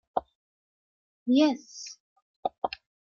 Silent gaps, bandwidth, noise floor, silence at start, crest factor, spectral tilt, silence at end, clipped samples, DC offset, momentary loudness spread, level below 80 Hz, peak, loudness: 0.35-1.26 s, 2.00-2.16 s, 2.22-2.43 s, 2.58-2.62 s; 7.4 kHz; under -90 dBFS; 0.15 s; 20 dB; -3.5 dB/octave; 0.35 s; under 0.1%; under 0.1%; 18 LU; -70 dBFS; -12 dBFS; -29 LUFS